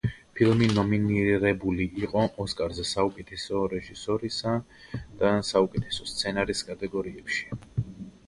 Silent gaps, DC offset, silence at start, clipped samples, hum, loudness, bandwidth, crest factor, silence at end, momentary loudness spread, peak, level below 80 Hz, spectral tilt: none; under 0.1%; 0.05 s; under 0.1%; none; -27 LUFS; 11.5 kHz; 20 dB; 0.15 s; 11 LU; -8 dBFS; -48 dBFS; -5.5 dB/octave